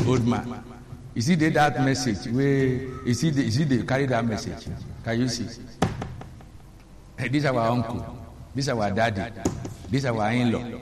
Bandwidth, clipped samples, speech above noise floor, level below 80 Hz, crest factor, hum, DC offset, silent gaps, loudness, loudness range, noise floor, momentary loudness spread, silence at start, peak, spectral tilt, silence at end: 13 kHz; under 0.1%; 22 dB; -46 dBFS; 20 dB; none; under 0.1%; none; -25 LUFS; 6 LU; -46 dBFS; 14 LU; 0 s; -6 dBFS; -6 dB/octave; 0 s